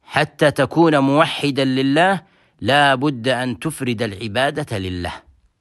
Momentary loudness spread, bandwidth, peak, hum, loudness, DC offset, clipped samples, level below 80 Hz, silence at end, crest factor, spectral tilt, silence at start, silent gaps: 10 LU; 12.5 kHz; -2 dBFS; none; -18 LUFS; under 0.1%; under 0.1%; -52 dBFS; 0.4 s; 18 dB; -5.5 dB/octave; 0.1 s; none